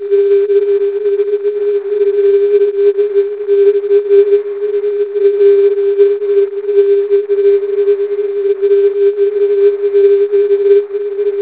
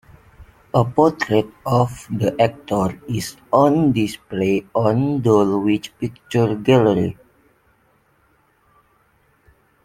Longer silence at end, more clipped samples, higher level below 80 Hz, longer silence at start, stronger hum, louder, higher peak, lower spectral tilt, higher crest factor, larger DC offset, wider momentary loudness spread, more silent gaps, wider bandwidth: second, 0 s vs 2.75 s; neither; second, -62 dBFS vs -52 dBFS; second, 0 s vs 0.4 s; neither; first, -12 LUFS vs -19 LUFS; about the same, 0 dBFS vs 0 dBFS; first, -9 dB/octave vs -7 dB/octave; second, 10 dB vs 20 dB; neither; second, 5 LU vs 8 LU; neither; second, 4 kHz vs 16 kHz